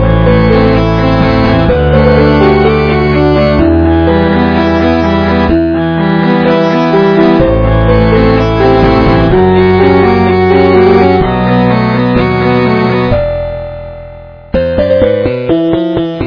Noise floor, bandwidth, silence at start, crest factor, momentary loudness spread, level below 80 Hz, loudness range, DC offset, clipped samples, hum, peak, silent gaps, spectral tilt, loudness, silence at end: -29 dBFS; 5.4 kHz; 0 s; 8 dB; 5 LU; -20 dBFS; 5 LU; under 0.1%; 1%; none; 0 dBFS; none; -9 dB/octave; -8 LUFS; 0 s